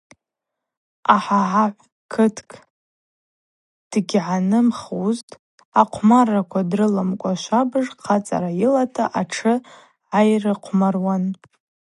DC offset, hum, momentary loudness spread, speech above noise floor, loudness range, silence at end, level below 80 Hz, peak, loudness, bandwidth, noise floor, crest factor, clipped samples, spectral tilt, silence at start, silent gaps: under 0.1%; none; 8 LU; 64 dB; 4 LU; 0.65 s; -64 dBFS; 0 dBFS; -20 LUFS; 11.5 kHz; -83 dBFS; 20 dB; under 0.1%; -6.5 dB/octave; 1.1 s; 1.92-2.09 s, 2.70-3.91 s, 5.23-5.28 s, 5.39-5.58 s, 5.65-5.72 s